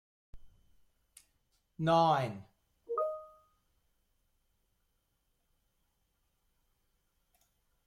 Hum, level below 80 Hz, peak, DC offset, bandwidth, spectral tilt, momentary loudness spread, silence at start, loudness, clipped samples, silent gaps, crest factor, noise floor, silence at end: none; -68 dBFS; -16 dBFS; under 0.1%; 14 kHz; -6.5 dB/octave; 17 LU; 0.35 s; -32 LUFS; under 0.1%; none; 22 dB; -79 dBFS; 4.6 s